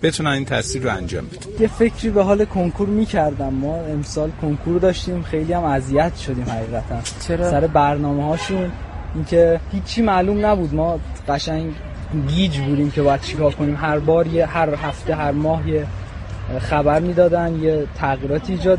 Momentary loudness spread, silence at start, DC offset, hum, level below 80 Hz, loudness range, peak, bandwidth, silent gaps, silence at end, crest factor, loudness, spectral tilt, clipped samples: 9 LU; 0 s; under 0.1%; none; -32 dBFS; 2 LU; -2 dBFS; 11.5 kHz; none; 0 s; 16 dB; -19 LUFS; -6.5 dB/octave; under 0.1%